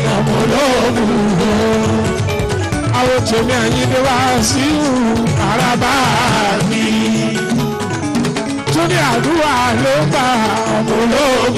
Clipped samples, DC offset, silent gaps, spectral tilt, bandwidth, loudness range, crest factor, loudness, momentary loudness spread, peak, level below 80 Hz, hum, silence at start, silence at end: under 0.1%; under 0.1%; none; -5 dB/octave; 15 kHz; 2 LU; 10 dB; -14 LUFS; 4 LU; -4 dBFS; -34 dBFS; none; 0 s; 0 s